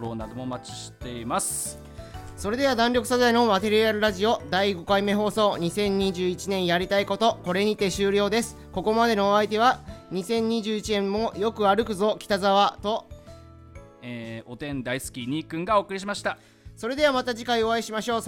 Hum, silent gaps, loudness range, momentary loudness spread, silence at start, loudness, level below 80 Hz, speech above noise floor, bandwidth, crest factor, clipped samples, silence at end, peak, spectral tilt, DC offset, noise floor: none; none; 6 LU; 14 LU; 0 s; -24 LUFS; -50 dBFS; 22 dB; 17.5 kHz; 18 dB; under 0.1%; 0 s; -8 dBFS; -4 dB/octave; under 0.1%; -46 dBFS